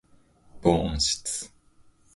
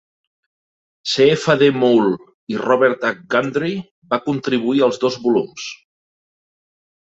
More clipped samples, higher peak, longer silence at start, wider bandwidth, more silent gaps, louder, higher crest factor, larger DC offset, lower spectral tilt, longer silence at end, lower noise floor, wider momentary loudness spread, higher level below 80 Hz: neither; about the same, -4 dBFS vs -2 dBFS; second, 0.55 s vs 1.05 s; first, 12 kHz vs 8 kHz; second, none vs 2.34-2.47 s, 3.91-4.02 s; second, -26 LUFS vs -17 LUFS; first, 24 dB vs 18 dB; neither; second, -4 dB/octave vs -5.5 dB/octave; second, 0.7 s vs 1.25 s; second, -58 dBFS vs under -90 dBFS; second, 10 LU vs 14 LU; first, -42 dBFS vs -62 dBFS